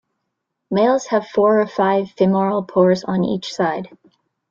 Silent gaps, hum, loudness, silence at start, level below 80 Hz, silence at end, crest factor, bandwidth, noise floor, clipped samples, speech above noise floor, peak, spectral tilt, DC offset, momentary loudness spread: none; none; -18 LUFS; 0.7 s; -60 dBFS; 0.65 s; 16 dB; 7.6 kHz; -77 dBFS; under 0.1%; 59 dB; -4 dBFS; -6.5 dB/octave; under 0.1%; 6 LU